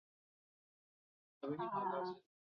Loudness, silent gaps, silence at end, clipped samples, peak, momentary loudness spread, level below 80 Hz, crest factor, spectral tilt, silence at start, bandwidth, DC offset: -43 LUFS; none; 0.35 s; under 0.1%; -28 dBFS; 10 LU; -88 dBFS; 18 dB; -5 dB/octave; 1.4 s; 6 kHz; under 0.1%